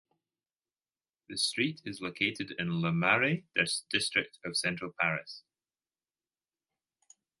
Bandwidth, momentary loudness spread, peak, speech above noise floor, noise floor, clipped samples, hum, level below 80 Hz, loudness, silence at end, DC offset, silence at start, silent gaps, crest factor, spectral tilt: 12 kHz; 12 LU; -10 dBFS; over 58 dB; under -90 dBFS; under 0.1%; none; -70 dBFS; -31 LUFS; 2 s; under 0.1%; 1.3 s; none; 24 dB; -3.5 dB/octave